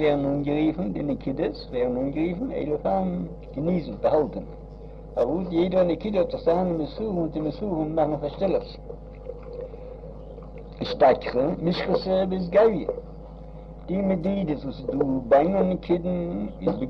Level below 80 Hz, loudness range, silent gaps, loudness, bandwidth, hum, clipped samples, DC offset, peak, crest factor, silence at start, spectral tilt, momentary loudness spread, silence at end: -42 dBFS; 4 LU; none; -25 LUFS; 6.2 kHz; none; under 0.1%; under 0.1%; -8 dBFS; 18 dB; 0 s; -9 dB/octave; 20 LU; 0 s